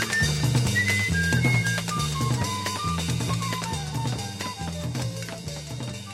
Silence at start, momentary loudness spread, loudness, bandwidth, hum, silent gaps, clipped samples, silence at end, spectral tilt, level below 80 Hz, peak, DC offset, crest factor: 0 s; 12 LU; -26 LUFS; 16 kHz; none; none; under 0.1%; 0 s; -4 dB/octave; -42 dBFS; -10 dBFS; under 0.1%; 16 dB